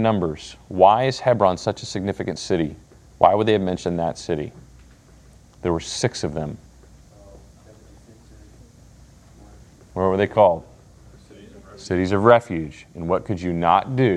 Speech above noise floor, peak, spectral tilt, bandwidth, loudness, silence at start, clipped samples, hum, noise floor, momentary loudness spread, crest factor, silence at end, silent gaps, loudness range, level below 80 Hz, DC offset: 29 dB; 0 dBFS; -6 dB/octave; 11 kHz; -21 LUFS; 0 s; under 0.1%; none; -49 dBFS; 15 LU; 22 dB; 0 s; none; 9 LU; -50 dBFS; under 0.1%